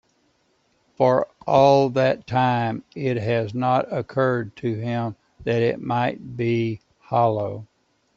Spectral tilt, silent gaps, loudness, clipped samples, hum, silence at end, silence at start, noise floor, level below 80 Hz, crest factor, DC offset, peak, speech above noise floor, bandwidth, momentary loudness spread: -7.5 dB/octave; none; -22 LUFS; under 0.1%; none; 0.55 s; 1 s; -66 dBFS; -60 dBFS; 18 dB; under 0.1%; -4 dBFS; 44 dB; 7.2 kHz; 10 LU